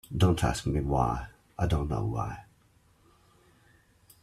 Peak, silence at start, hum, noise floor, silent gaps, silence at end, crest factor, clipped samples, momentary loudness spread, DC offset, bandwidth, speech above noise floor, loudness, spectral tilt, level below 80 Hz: -12 dBFS; 0.1 s; none; -64 dBFS; none; 1.8 s; 18 dB; under 0.1%; 12 LU; under 0.1%; 14 kHz; 36 dB; -30 LUFS; -6.5 dB/octave; -42 dBFS